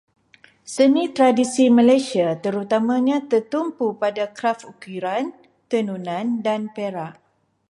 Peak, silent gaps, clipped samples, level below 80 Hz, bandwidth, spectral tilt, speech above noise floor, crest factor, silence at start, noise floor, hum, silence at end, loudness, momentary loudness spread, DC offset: -4 dBFS; none; under 0.1%; -72 dBFS; 11.5 kHz; -5 dB/octave; 34 dB; 16 dB; 0.65 s; -54 dBFS; none; 0.55 s; -20 LUFS; 13 LU; under 0.1%